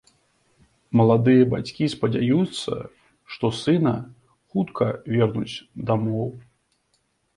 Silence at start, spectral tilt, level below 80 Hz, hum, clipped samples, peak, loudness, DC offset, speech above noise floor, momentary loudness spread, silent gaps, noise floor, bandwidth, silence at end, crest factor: 0.9 s; -7.5 dB/octave; -56 dBFS; none; under 0.1%; -4 dBFS; -23 LUFS; under 0.1%; 48 dB; 15 LU; none; -69 dBFS; 11 kHz; 0.95 s; 18 dB